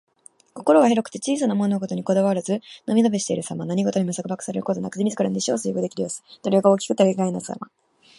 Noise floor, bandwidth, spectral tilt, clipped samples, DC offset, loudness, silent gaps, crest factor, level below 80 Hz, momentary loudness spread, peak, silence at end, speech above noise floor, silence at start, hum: -48 dBFS; 11.5 kHz; -5.5 dB/octave; under 0.1%; under 0.1%; -22 LUFS; none; 20 dB; -68 dBFS; 10 LU; -2 dBFS; 0.55 s; 27 dB; 0.55 s; none